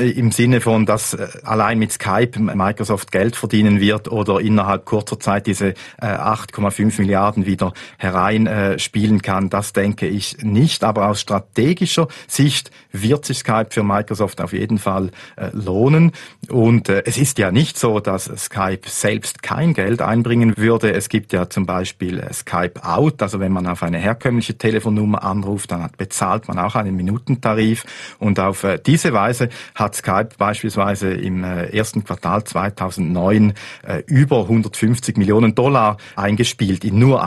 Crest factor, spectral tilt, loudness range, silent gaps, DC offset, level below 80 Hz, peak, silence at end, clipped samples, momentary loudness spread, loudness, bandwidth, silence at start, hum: 16 dB; -5.5 dB/octave; 3 LU; none; under 0.1%; -48 dBFS; 0 dBFS; 0 s; under 0.1%; 8 LU; -18 LUFS; 12.5 kHz; 0 s; none